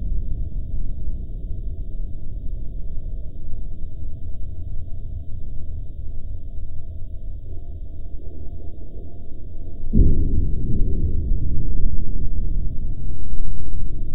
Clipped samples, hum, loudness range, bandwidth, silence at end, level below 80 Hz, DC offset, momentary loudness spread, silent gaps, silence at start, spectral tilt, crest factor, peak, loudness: under 0.1%; none; 11 LU; 0.7 kHz; 0 s; -24 dBFS; under 0.1%; 13 LU; none; 0 s; -13.5 dB/octave; 14 dB; -2 dBFS; -30 LUFS